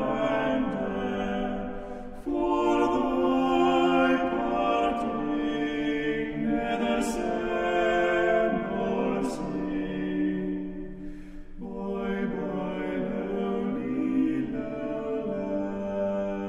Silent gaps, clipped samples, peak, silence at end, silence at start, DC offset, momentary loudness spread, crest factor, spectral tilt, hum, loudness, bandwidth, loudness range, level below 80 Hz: none; under 0.1%; -12 dBFS; 0 s; 0 s; under 0.1%; 10 LU; 16 dB; -6.5 dB/octave; none; -28 LUFS; 13 kHz; 7 LU; -46 dBFS